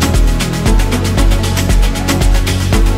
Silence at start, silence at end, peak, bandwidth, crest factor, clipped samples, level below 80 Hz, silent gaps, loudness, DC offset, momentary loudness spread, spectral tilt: 0 s; 0 s; 0 dBFS; 16 kHz; 10 dB; under 0.1%; -12 dBFS; none; -14 LUFS; under 0.1%; 1 LU; -5 dB/octave